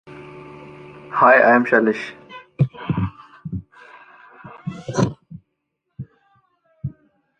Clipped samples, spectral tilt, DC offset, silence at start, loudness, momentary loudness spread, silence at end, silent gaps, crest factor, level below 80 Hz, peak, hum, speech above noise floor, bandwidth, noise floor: under 0.1%; -7 dB/octave; under 0.1%; 0.1 s; -18 LUFS; 27 LU; 0.5 s; none; 20 dB; -50 dBFS; -2 dBFS; none; 61 dB; 9.2 kHz; -75 dBFS